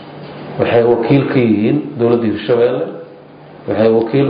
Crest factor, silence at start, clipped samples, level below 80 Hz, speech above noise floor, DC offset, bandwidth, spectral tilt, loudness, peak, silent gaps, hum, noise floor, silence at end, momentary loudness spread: 12 dB; 0 s; under 0.1%; -48 dBFS; 24 dB; under 0.1%; 5.2 kHz; -13 dB/octave; -14 LUFS; -2 dBFS; none; none; -37 dBFS; 0 s; 17 LU